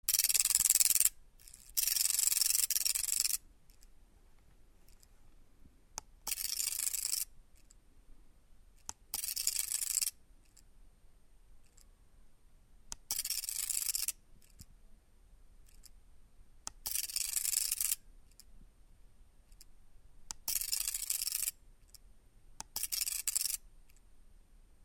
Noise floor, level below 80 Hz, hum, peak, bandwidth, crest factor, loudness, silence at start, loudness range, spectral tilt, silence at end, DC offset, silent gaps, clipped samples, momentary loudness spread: -61 dBFS; -60 dBFS; none; -8 dBFS; 17.5 kHz; 30 dB; -32 LUFS; 0.1 s; 10 LU; 3 dB/octave; 0.5 s; under 0.1%; none; under 0.1%; 21 LU